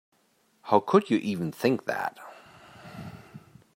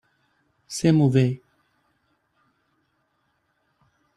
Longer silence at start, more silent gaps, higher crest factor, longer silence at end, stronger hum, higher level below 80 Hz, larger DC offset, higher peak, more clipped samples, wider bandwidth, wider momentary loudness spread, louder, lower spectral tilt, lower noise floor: about the same, 0.65 s vs 0.7 s; neither; about the same, 24 dB vs 20 dB; second, 0.4 s vs 2.8 s; neither; second, -70 dBFS vs -62 dBFS; neither; about the same, -6 dBFS vs -6 dBFS; neither; first, 16 kHz vs 12.5 kHz; first, 25 LU vs 16 LU; second, -26 LUFS vs -21 LUFS; about the same, -6.5 dB/octave vs -7 dB/octave; about the same, -68 dBFS vs -71 dBFS